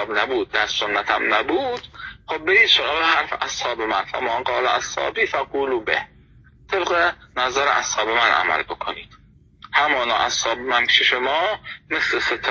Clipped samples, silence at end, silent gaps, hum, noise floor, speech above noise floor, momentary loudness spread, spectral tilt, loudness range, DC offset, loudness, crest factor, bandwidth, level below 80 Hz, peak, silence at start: under 0.1%; 0 s; none; none; -50 dBFS; 29 dB; 11 LU; -1.5 dB/octave; 3 LU; under 0.1%; -19 LUFS; 18 dB; 7.4 kHz; -52 dBFS; -2 dBFS; 0 s